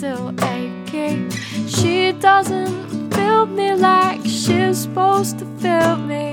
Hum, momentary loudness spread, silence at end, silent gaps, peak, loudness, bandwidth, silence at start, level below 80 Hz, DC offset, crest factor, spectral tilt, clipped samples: none; 10 LU; 0 s; none; -2 dBFS; -18 LUFS; 18.5 kHz; 0 s; -58 dBFS; under 0.1%; 16 dB; -4.5 dB/octave; under 0.1%